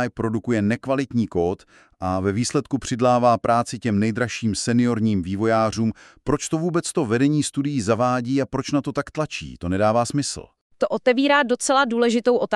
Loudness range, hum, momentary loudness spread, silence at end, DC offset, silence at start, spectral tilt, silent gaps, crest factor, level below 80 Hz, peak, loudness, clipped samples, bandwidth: 2 LU; none; 9 LU; 0 s; under 0.1%; 0 s; -5.5 dB/octave; 10.61-10.70 s; 18 dB; -50 dBFS; -4 dBFS; -22 LUFS; under 0.1%; 12 kHz